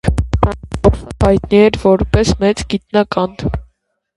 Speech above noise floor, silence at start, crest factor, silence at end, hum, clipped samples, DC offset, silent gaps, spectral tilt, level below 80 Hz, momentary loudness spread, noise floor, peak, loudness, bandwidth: 46 dB; 0.05 s; 14 dB; 0.55 s; none; under 0.1%; under 0.1%; none; -6.5 dB/octave; -24 dBFS; 9 LU; -59 dBFS; 0 dBFS; -14 LUFS; 11.5 kHz